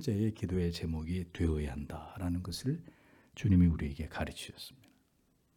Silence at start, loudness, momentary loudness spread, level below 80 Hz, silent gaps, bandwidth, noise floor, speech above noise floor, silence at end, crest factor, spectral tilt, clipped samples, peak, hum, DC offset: 0 s; -35 LUFS; 16 LU; -48 dBFS; none; 15 kHz; -72 dBFS; 39 dB; 0.8 s; 18 dB; -7 dB/octave; under 0.1%; -16 dBFS; none; under 0.1%